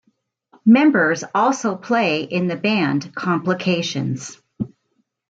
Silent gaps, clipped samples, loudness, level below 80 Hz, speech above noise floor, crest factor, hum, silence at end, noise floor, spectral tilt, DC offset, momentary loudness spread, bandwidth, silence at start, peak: none; under 0.1%; -19 LUFS; -62 dBFS; 51 dB; 16 dB; none; 0.65 s; -69 dBFS; -5.5 dB/octave; under 0.1%; 17 LU; 8 kHz; 0.65 s; -4 dBFS